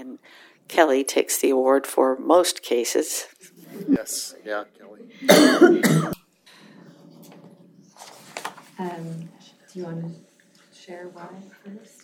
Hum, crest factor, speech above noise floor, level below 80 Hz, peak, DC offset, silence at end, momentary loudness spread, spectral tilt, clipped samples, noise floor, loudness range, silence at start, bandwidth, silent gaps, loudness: none; 24 dB; 35 dB; -66 dBFS; 0 dBFS; under 0.1%; 0.25 s; 26 LU; -4 dB/octave; under 0.1%; -56 dBFS; 18 LU; 0 s; 18 kHz; none; -20 LUFS